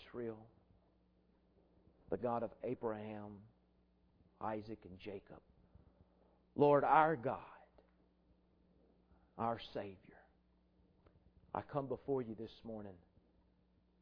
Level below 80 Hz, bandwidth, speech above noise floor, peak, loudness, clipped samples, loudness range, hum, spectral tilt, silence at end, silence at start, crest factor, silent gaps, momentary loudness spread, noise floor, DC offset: -72 dBFS; 5.4 kHz; 35 dB; -16 dBFS; -39 LUFS; under 0.1%; 12 LU; none; -5.5 dB/octave; 1.05 s; 0 s; 26 dB; none; 21 LU; -74 dBFS; under 0.1%